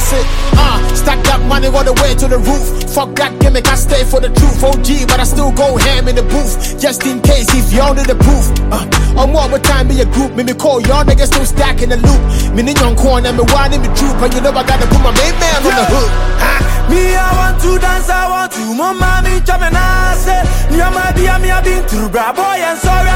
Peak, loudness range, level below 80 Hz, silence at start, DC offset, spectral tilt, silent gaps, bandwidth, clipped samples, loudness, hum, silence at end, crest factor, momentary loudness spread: 0 dBFS; 2 LU; -12 dBFS; 0 s; under 0.1%; -4.5 dB/octave; none; 16.5 kHz; under 0.1%; -12 LUFS; none; 0 s; 8 dB; 4 LU